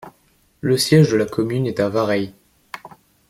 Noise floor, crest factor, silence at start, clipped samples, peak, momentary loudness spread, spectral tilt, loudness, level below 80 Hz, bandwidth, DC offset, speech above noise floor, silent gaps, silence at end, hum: -59 dBFS; 18 dB; 0.05 s; under 0.1%; -2 dBFS; 23 LU; -6 dB/octave; -18 LUFS; -54 dBFS; 16 kHz; under 0.1%; 42 dB; none; 0.4 s; none